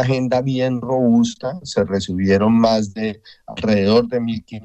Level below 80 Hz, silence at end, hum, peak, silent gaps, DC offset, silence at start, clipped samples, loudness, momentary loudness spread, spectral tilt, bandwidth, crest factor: -50 dBFS; 0 s; none; -4 dBFS; none; under 0.1%; 0 s; under 0.1%; -18 LUFS; 11 LU; -6.5 dB/octave; 8.4 kHz; 14 dB